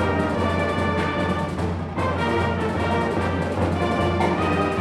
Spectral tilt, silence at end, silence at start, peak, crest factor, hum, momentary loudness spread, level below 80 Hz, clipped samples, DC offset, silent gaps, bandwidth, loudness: -7 dB/octave; 0 s; 0 s; -8 dBFS; 14 dB; none; 4 LU; -46 dBFS; under 0.1%; under 0.1%; none; 12 kHz; -23 LUFS